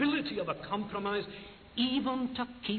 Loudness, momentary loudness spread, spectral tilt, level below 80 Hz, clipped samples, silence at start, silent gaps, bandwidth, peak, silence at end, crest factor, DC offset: -34 LUFS; 10 LU; -8 dB/octave; -62 dBFS; under 0.1%; 0 s; none; 4.6 kHz; -18 dBFS; 0 s; 16 dB; under 0.1%